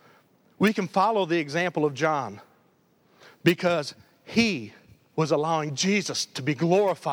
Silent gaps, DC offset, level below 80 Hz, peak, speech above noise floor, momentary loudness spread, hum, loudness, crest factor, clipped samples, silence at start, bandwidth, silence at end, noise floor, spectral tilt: none; under 0.1%; -66 dBFS; -6 dBFS; 39 dB; 7 LU; none; -25 LUFS; 20 dB; under 0.1%; 0.6 s; over 20 kHz; 0 s; -63 dBFS; -5 dB/octave